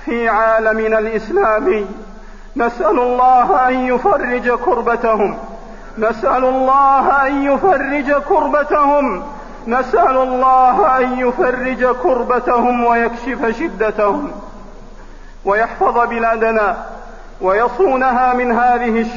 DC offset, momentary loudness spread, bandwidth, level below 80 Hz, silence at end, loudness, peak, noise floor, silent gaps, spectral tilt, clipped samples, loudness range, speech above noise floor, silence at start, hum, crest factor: 0.8%; 9 LU; 7.4 kHz; -36 dBFS; 0 s; -14 LUFS; -2 dBFS; -34 dBFS; none; -6.5 dB/octave; under 0.1%; 4 LU; 20 dB; 0 s; none; 12 dB